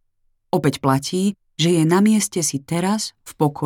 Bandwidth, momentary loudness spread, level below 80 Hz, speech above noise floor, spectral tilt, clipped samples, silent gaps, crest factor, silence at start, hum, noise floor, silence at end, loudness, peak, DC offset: 17.5 kHz; 8 LU; -58 dBFS; 46 dB; -5 dB/octave; under 0.1%; none; 16 dB; 0.55 s; none; -65 dBFS; 0 s; -20 LUFS; -4 dBFS; under 0.1%